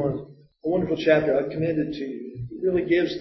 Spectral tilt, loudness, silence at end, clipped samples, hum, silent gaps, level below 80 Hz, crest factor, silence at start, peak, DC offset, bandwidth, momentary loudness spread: -8 dB/octave; -24 LUFS; 0 s; under 0.1%; none; none; -54 dBFS; 18 dB; 0 s; -6 dBFS; under 0.1%; 6 kHz; 14 LU